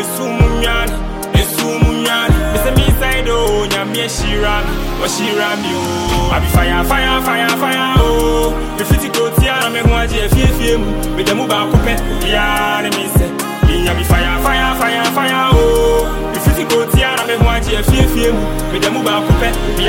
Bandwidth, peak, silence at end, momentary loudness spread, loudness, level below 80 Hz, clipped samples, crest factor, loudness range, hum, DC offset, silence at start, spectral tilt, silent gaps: 17 kHz; 0 dBFS; 0 s; 5 LU; -14 LUFS; -18 dBFS; under 0.1%; 12 dB; 2 LU; none; under 0.1%; 0 s; -4.5 dB/octave; none